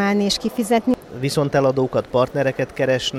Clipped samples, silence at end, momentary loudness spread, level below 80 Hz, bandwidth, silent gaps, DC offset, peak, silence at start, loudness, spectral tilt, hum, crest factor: under 0.1%; 0 s; 4 LU; -48 dBFS; 16 kHz; none; under 0.1%; -4 dBFS; 0 s; -20 LUFS; -5 dB/octave; none; 14 dB